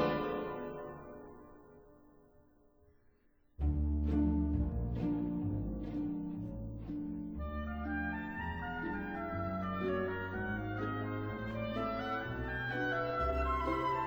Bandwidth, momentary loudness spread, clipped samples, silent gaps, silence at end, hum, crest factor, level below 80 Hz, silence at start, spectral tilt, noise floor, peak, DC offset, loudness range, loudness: over 20 kHz; 9 LU; under 0.1%; none; 0 s; none; 16 dB; -44 dBFS; 0 s; -8.5 dB/octave; -68 dBFS; -22 dBFS; under 0.1%; 6 LU; -37 LUFS